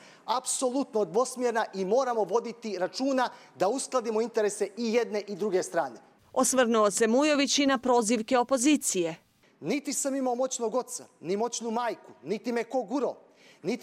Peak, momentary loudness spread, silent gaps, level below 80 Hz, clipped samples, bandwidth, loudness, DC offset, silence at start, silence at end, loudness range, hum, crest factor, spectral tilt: -12 dBFS; 10 LU; none; -76 dBFS; under 0.1%; 16 kHz; -28 LUFS; under 0.1%; 0.25 s; 0 s; 6 LU; none; 16 dB; -3 dB/octave